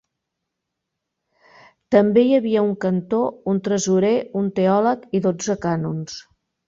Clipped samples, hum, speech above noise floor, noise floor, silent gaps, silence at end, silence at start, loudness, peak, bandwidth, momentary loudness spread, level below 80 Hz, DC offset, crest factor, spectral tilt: under 0.1%; none; 61 dB; -80 dBFS; none; 0.45 s; 1.9 s; -20 LUFS; -2 dBFS; 7.8 kHz; 8 LU; -60 dBFS; under 0.1%; 18 dB; -6 dB/octave